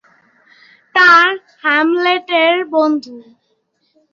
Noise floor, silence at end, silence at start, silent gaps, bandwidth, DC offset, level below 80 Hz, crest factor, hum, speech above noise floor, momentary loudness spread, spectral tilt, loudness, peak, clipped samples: -64 dBFS; 0.9 s; 0.95 s; none; 7.6 kHz; under 0.1%; -70 dBFS; 14 dB; none; 52 dB; 10 LU; -3 dB/octave; -12 LUFS; -2 dBFS; under 0.1%